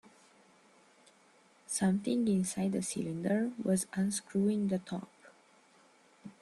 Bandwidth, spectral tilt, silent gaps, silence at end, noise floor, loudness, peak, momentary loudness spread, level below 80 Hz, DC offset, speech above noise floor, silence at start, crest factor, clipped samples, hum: 12.5 kHz; -5.5 dB/octave; none; 0.1 s; -65 dBFS; -33 LUFS; -20 dBFS; 12 LU; -72 dBFS; under 0.1%; 32 dB; 1.7 s; 16 dB; under 0.1%; none